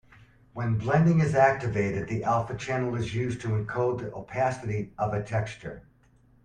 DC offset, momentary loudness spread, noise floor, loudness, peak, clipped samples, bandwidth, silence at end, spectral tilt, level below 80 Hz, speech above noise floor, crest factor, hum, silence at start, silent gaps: under 0.1%; 13 LU; -60 dBFS; -27 LUFS; -8 dBFS; under 0.1%; 9.6 kHz; 0.65 s; -7.5 dB/octave; -54 dBFS; 34 dB; 20 dB; none; 0.55 s; none